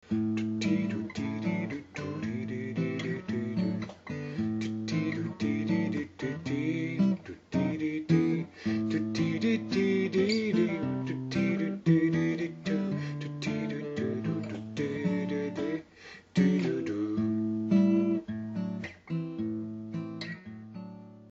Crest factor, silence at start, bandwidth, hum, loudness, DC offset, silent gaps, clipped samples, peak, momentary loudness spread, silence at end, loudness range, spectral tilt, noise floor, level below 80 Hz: 18 dB; 0.05 s; 7.8 kHz; none; -31 LUFS; under 0.1%; none; under 0.1%; -12 dBFS; 11 LU; 0 s; 5 LU; -7 dB/octave; -51 dBFS; -66 dBFS